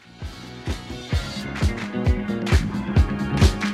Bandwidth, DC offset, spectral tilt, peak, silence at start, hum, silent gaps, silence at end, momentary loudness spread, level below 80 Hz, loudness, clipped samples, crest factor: 13 kHz; under 0.1%; -6 dB/octave; -4 dBFS; 0.15 s; none; none; 0 s; 14 LU; -26 dBFS; -24 LUFS; under 0.1%; 18 dB